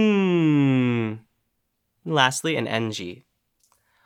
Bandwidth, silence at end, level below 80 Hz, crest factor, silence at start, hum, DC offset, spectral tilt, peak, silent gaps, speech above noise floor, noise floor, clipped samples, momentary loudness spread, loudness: 16 kHz; 0.9 s; -70 dBFS; 22 dB; 0 s; none; under 0.1%; -5.5 dB/octave; -2 dBFS; none; 51 dB; -75 dBFS; under 0.1%; 16 LU; -22 LUFS